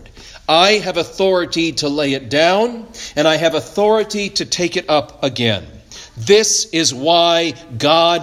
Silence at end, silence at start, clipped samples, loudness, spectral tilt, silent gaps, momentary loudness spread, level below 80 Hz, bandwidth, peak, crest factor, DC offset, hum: 0 s; 0 s; under 0.1%; -15 LUFS; -3 dB/octave; none; 11 LU; -48 dBFS; 15.5 kHz; 0 dBFS; 16 dB; under 0.1%; none